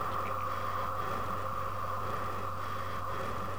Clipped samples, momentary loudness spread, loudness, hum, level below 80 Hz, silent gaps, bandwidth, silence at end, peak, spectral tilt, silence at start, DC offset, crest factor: under 0.1%; 3 LU; -36 LUFS; none; -56 dBFS; none; 17 kHz; 0 s; -22 dBFS; -5.5 dB/octave; 0 s; 1%; 14 dB